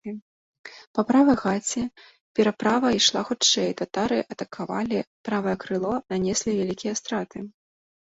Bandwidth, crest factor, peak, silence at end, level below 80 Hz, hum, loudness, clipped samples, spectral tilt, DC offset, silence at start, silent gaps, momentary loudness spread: 8 kHz; 20 dB; -6 dBFS; 0.7 s; -58 dBFS; none; -24 LUFS; under 0.1%; -3.5 dB/octave; under 0.1%; 0.05 s; 0.22-0.53 s, 0.59-0.64 s, 0.87-0.94 s, 2.20-2.35 s, 5.07-5.24 s; 15 LU